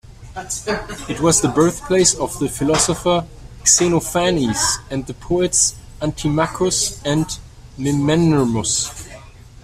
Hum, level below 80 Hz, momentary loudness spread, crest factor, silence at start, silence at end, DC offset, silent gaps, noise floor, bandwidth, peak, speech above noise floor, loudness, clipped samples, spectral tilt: none; -40 dBFS; 12 LU; 18 dB; 0.1 s; 0.15 s; under 0.1%; none; -40 dBFS; 15.5 kHz; 0 dBFS; 22 dB; -18 LUFS; under 0.1%; -3.5 dB/octave